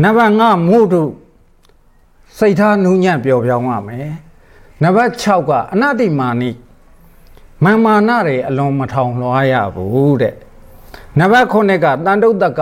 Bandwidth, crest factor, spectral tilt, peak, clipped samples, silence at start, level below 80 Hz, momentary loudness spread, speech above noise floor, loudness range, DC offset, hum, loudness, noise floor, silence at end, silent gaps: 15.5 kHz; 12 dB; -7.5 dB/octave; 0 dBFS; under 0.1%; 0 s; -46 dBFS; 10 LU; 36 dB; 2 LU; under 0.1%; none; -13 LUFS; -48 dBFS; 0 s; none